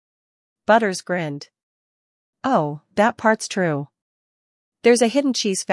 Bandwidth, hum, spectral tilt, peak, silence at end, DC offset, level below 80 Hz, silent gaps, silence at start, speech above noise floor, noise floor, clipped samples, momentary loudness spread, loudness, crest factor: 12 kHz; none; -4 dB/octave; -4 dBFS; 0 s; under 0.1%; -70 dBFS; 1.63-2.33 s, 4.02-4.72 s; 0.7 s; over 71 dB; under -90 dBFS; under 0.1%; 12 LU; -20 LUFS; 18 dB